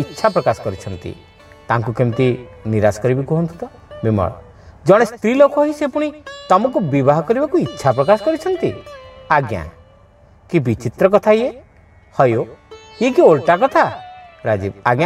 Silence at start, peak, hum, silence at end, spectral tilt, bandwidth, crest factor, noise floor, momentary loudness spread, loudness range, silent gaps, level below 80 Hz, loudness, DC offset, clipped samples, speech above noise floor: 0 s; 0 dBFS; none; 0 s; -7 dB/octave; 13.5 kHz; 16 dB; -47 dBFS; 15 LU; 4 LU; none; -48 dBFS; -16 LUFS; under 0.1%; under 0.1%; 32 dB